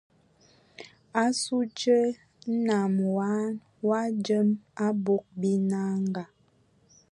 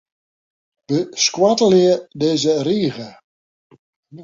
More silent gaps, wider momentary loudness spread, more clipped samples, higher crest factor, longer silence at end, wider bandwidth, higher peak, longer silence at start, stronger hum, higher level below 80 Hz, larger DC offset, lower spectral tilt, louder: second, none vs 3.24-3.70 s, 3.79-4.03 s; about the same, 10 LU vs 10 LU; neither; about the same, 18 dB vs 16 dB; first, 0.85 s vs 0 s; first, 11 kHz vs 7.6 kHz; second, -10 dBFS vs -2 dBFS; about the same, 0.8 s vs 0.9 s; neither; second, -74 dBFS vs -62 dBFS; neither; first, -6 dB/octave vs -4.5 dB/octave; second, -27 LUFS vs -17 LUFS